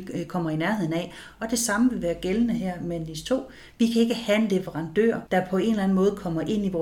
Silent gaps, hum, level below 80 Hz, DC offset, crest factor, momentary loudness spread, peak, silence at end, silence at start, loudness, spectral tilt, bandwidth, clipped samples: none; none; -50 dBFS; under 0.1%; 16 dB; 8 LU; -10 dBFS; 0 s; 0 s; -25 LUFS; -5.5 dB/octave; 18 kHz; under 0.1%